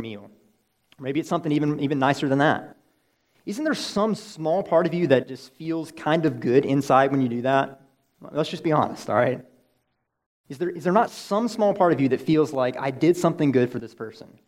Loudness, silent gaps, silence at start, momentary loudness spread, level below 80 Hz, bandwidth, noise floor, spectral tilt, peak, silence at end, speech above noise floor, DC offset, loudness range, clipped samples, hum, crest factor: -23 LUFS; 10.26-10.44 s; 0 s; 14 LU; -68 dBFS; 15.5 kHz; -74 dBFS; -6.5 dB/octave; -4 dBFS; 0.2 s; 51 dB; under 0.1%; 4 LU; under 0.1%; none; 20 dB